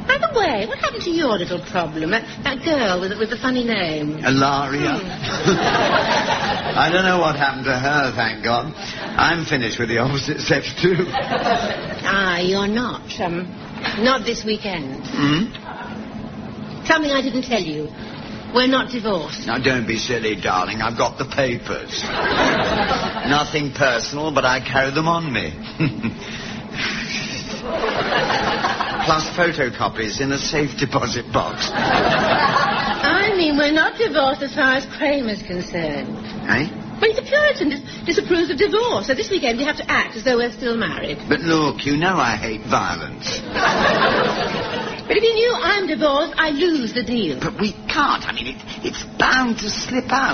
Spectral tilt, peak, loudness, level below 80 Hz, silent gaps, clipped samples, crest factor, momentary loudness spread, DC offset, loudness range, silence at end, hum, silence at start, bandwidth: -2.5 dB/octave; 0 dBFS; -19 LUFS; -44 dBFS; none; under 0.1%; 20 dB; 10 LU; under 0.1%; 4 LU; 0 s; none; 0 s; 6.6 kHz